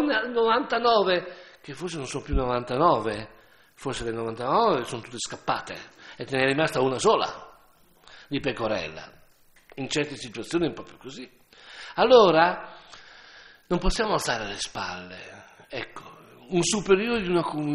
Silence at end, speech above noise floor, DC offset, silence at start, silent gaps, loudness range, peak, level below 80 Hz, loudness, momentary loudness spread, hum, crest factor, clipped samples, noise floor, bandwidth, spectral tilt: 0 s; 33 dB; under 0.1%; 0 s; none; 7 LU; -4 dBFS; -42 dBFS; -25 LUFS; 20 LU; none; 22 dB; under 0.1%; -58 dBFS; 13 kHz; -4 dB/octave